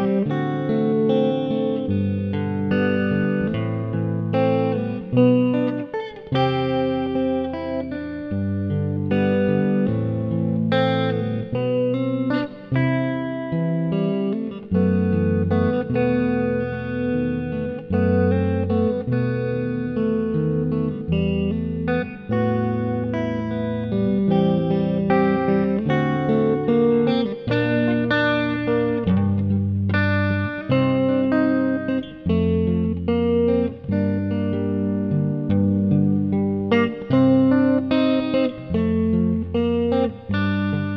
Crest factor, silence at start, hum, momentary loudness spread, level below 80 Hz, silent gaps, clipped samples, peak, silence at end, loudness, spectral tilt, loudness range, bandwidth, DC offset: 16 dB; 0 s; none; 6 LU; -46 dBFS; none; under 0.1%; -4 dBFS; 0 s; -21 LUFS; -10 dB/octave; 3 LU; 5.8 kHz; under 0.1%